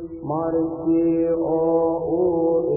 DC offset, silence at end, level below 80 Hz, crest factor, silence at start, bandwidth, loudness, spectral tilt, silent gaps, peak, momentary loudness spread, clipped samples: under 0.1%; 0 s; -50 dBFS; 10 dB; 0 s; 2.8 kHz; -21 LUFS; -16 dB/octave; none; -10 dBFS; 4 LU; under 0.1%